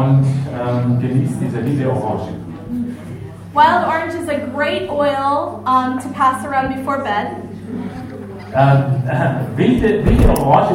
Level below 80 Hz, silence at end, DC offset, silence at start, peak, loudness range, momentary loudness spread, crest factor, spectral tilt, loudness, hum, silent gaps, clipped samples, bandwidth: -28 dBFS; 0 s; under 0.1%; 0 s; -2 dBFS; 3 LU; 14 LU; 16 dB; -7.5 dB/octave; -17 LUFS; none; none; under 0.1%; 16.5 kHz